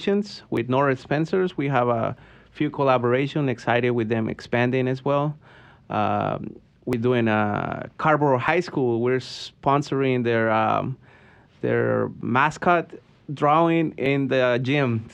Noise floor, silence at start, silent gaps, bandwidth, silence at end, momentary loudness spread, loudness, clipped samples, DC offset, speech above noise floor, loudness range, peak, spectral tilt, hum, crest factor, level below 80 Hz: -52 dBFS; 0 s; none; 9.2 kHz; 0.05 s; 10 LU; -23 LUFS; under 0.1%; under 0.1%; 30 dB; 3 LU; -6 dBFS; -7.5 dB/octave; none; 16 dB; -58 dBFS